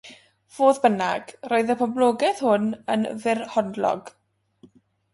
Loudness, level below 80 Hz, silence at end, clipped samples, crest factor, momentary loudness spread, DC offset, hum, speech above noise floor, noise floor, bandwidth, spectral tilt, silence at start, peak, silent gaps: -23 LUFS; -70 dBFS; 1.05 s; under 0.1%; 20 dB; 6 LU; under 0.1%; none; 34 dB; -56 dBFS; 11.5 kHz; -5 dB/octave; 0.05 s; -4 dBFS; none